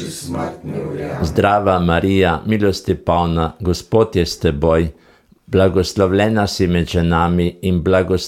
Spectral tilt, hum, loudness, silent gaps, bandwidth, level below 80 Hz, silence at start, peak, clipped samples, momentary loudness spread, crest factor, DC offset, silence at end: -6.5 dB/octave; none; -17 LUFS; none; 15 kHz; -34 dBFS; 0 s; -2 dBFS; under 0.1%; 10 LU; 14 dB; under 0.1%; 0 s